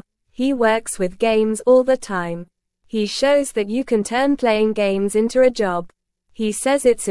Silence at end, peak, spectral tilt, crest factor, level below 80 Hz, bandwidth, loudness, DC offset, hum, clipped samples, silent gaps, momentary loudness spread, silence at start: 0 s; -4 dBFS; -4.5 dB/octave; 16 dB; -50 dBFS; 12 kHz; -19 LUFS; under 0.1%; none; under 0.1%; none; 9 LU; 0.4 s